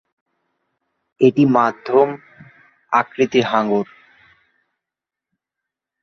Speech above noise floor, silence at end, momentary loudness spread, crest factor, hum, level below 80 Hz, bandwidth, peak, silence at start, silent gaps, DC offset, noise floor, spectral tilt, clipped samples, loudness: 70 dB; 2.2 s; 7 LU; 18 dB; none; -64 dBFS; 6.6 kHz; -2 dBFS; 1.2 s; none; under 0.1%; -86 dBFS; -7 dB/octave; under 0.1%; -17 LUFS